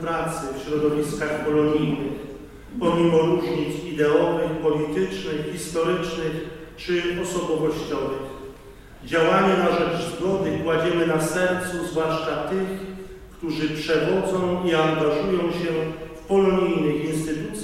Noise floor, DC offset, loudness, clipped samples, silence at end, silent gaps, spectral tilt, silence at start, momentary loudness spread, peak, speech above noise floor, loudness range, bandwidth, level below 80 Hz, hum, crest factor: -43 dBFS; under 0.1%; -23 LUFS; under 0.1%; 0 s; none; -5.5 dB/octave; 0 s; 13 LU; -6 dBFS; 21 dB; 4 LU; 15.5 kHz; -48 dBFS; none; 16 dB